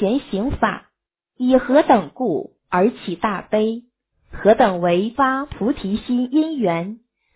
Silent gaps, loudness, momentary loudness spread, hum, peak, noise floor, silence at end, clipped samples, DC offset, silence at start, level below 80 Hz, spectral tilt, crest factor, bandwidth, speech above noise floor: none; -19 LUFS; 9 LU; none; -2 dBFS; -74 dBFS; 0.4 s; under 0.1%; under 0.1%; 0 s; -44 dBFS; -10.5 dB/octave; 18 dB; 4 kHz; 56 dB